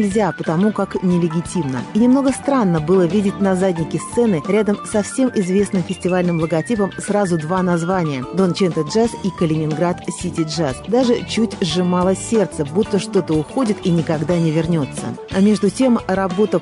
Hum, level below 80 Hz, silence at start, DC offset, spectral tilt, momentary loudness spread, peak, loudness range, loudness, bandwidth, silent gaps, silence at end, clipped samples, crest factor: none; -46 dBFS; 0 s; under 0.1%; -6.5 dB/octave; 5 LU; -6 dBFS; 2 LU; -18 LUFS; 11.5 kHz; none; 0 s; under 0.1%; 12 dB